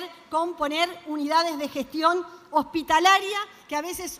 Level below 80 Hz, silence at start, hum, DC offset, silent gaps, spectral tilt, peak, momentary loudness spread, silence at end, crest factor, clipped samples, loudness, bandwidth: -60 dBFS; 0 s; none; under 0.1%; none; -1.5 dB/octave; -6 dBFS; 11 LU; 0 s; 20 dB; under 0.1%; -24 LUFS; 16 kHz